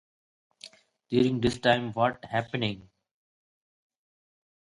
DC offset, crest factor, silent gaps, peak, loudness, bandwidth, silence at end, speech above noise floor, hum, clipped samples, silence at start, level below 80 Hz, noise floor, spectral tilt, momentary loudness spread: under 0.1%; 24 dB; none; -6 dBFS; -27 LUFS; 11.5 kHz; 1.9 s; 26 dB; none; under 0.1%; 0.65 s; -56 dBFS; -53 dBFS; -6 dB/octave; 23 LU